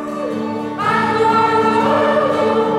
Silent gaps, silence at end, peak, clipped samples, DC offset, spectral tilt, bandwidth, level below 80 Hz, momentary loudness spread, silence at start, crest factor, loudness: none; 0 s; -4 dBFS; under 0.1%; under 0.1%; -6 dB/octave; 12.5 kHz; -54 dBFS; 9 LU; 0 s; 12 dB; -16 LUFS